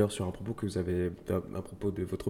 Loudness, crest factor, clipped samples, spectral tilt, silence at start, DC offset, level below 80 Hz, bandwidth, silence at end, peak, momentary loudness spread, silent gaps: -34 LUFS; 20 dB; under 0.1%; -6.5 dB/octave; 0 s; under 0.1%; -56 dBFS; 16.5 kHz; 0 s; -14 dBFS; 5 LU; none